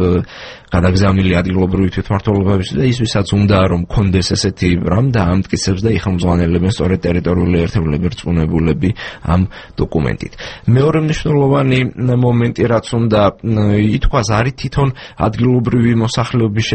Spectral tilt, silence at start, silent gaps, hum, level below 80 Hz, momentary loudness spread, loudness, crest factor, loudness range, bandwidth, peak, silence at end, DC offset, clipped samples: -6.5 dB/octave; 0 s; none; none; -28 dBFS; 6 LU; -15 LUFS; 14 dB; 2 LU; 8.8 kHz; 0 dBFS; 0 s; under 0.1%; under 0.1%